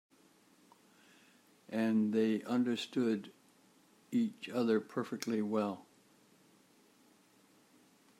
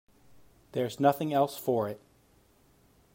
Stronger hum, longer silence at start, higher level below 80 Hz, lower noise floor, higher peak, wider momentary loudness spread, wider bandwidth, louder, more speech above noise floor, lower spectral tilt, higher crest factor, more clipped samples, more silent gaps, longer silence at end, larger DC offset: neither; first, 1.7 s vs 0.75 s; second, -90 dBFS vs -70 dBFS; about the same, -67 dBFS vs -64 dBFS; second, -18 dBFS vs -10 dBFS; second, 8 LU vs 11 LU; second, 14.5 kHz vs 16 kHz; second, -35 LUFS vs -29 LUFS; about the same, 33 dB vs 36 dB; about the same, -6 dB/octave vs -6.5 dB/octave; about the same, 20 dB vs 22 dB; neither; neither; first, 2.35 s vs 1.2 s; neither